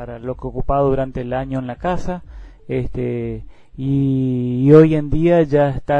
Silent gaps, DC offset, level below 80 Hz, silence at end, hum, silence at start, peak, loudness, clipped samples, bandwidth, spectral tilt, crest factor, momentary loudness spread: none; under 0.1%; -32 dBFS; 0 s; none; 0 s; 0 dBFS; -18 LUFS; under 0.1%; 8 kHz; -9.5 dB/octave; 16 dB; 16 LU